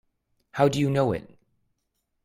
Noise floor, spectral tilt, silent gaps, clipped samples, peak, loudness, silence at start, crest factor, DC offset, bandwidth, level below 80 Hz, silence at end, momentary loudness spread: -77 dBFS; -6.5 dB/octave; none; under 0.1%; -6 dBFS; -24 LUFS; 0.55 s; 22 dB; under 0.1%; 15.5 kHz; -58 dBFS; 1.05 s; 12 LU